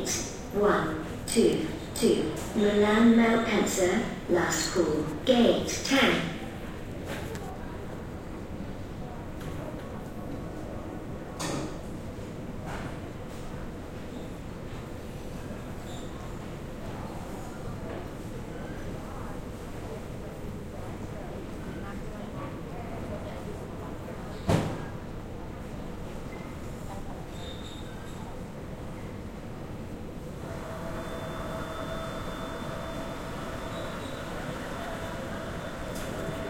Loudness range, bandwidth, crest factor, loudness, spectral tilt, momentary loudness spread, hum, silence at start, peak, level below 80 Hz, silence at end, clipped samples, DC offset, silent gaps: 15 LU; 16.5 kHz; 22 dB; -32 LUFS; -5 dB/octave; 15 LU; none; 0 s; -10 dBFS; -44 dBFS; 0 s; under 0.1%; under 0.1%; none